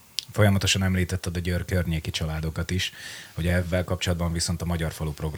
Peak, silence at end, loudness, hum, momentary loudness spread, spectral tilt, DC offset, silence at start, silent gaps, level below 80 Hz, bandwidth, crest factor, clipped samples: -4 dBFS; 0 s; -26 LUFS; none; 8 LU; -4.5 dB/octave; under 0.1%; 0.2 s; none; -40 dBFS; over 20 kHz; 22 dB; under 0.1%